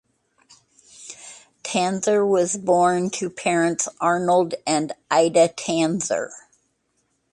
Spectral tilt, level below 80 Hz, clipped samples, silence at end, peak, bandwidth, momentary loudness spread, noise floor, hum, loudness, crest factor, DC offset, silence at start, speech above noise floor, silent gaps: -4 dB/octave; -68 dBFS; under 0.1%; 0.95 s; -4 dBFS; 11.5 kHz; 18 LU; -70 dBFS; none; -21 LUFS; 18 dB; under 0.1%; 1 s; 50 dB; none